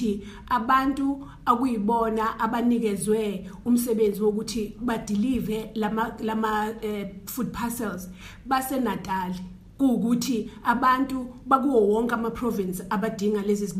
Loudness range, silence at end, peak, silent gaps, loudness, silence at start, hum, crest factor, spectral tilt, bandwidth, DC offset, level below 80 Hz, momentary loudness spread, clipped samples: 5 LU; 0 s; -6 dBFS; none; -25 LUFS; 0 s; none; 20 dB; -5.5 dB/octave; 15.5 kHz; under 0.1%; -50 dBFS; 10 LU; under 0.1%